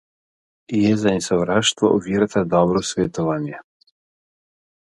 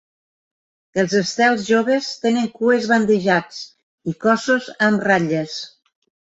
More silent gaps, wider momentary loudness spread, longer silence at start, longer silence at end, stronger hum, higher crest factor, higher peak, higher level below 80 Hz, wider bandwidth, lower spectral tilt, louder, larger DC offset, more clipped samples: second, none vs 3.83-3.98 s; second, 8 LU vs 14 LU; second, 0.7 s vs 0.95 s; first, 1.25 s vs 0.7 s; neither; about the same, 20 dB vs 16 dB; about the same, -2 dBFS vs -2 dBFS; first, -50 dBFS vs -62 dBFS; first, 11.5 kHz vs 8 kHz; about the same, -5 dB/octave vs -5 dB/octave; about the same, -19 LUFS vs -18 LUFS; neither; neither